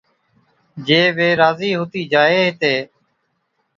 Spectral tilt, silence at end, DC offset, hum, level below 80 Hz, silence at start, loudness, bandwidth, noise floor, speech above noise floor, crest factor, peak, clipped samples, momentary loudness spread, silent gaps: -5.5 dB/octave; 0.95 s; under 0.1%; none; -62 dBFS; 0.75 s; -16 LUFS; 7.4 kHz; -69 dBFS; 53 dB; 18 dB; 0 dBFS; under 0.1%; 9 LU; none